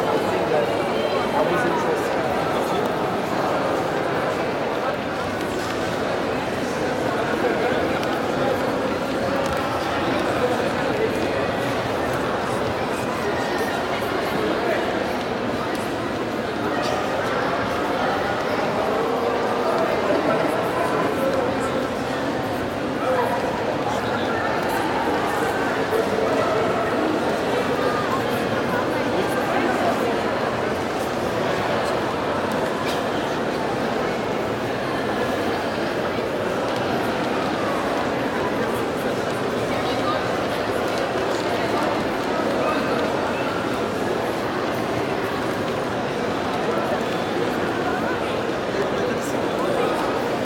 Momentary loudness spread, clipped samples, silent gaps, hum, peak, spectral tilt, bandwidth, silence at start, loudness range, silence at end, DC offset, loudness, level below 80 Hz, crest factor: 3 LU; under 0.1%; none; none; -8 dBFS; -5 dB/octave; 18.5 kHz; 0 s; 2 LU; 0 s; under 0.1%; -23 LUFS; -48 dBFS; 16 dB